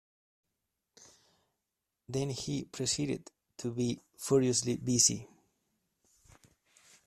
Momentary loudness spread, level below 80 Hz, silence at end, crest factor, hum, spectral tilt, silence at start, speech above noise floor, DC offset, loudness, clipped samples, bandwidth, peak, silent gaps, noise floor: 15 LU; -66 dBFS; 1.8 s; 24 dB; none; -4 dB/octave; 2.1 s; 55 dB; under 0.1%; -32 LUFS; under 0.1%; 14 kHz; -12 dBFS; none; -87 dBFS